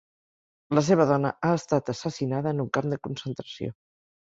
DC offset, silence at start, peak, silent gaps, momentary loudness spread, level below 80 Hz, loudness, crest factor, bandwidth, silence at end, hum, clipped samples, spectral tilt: under 0.1%; 0.7 s; -6 dBFS; none; 14 LU; -62 dBFS; -26 LUFS; 20 dB; 8 kHz; 0.6 s; none; under 0.1%; -6.5 dB/octave